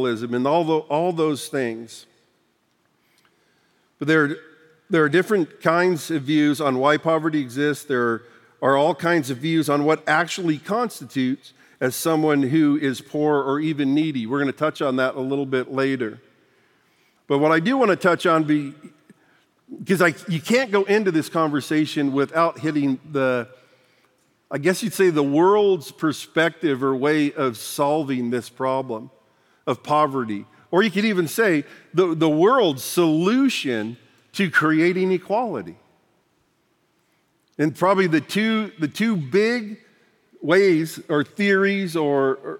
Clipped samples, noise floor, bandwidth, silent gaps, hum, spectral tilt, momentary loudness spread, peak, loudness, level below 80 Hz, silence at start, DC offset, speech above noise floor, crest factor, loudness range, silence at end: under 0.1%; -66 dBFS; 17 kHz; none; none; -5.5 dB/octave; 9 LU; -2 dBFS; -21 LUFS; -78 dBFS; 0 s; under 0.1%; 46 dB; 20 dB; 4 LU; 0 s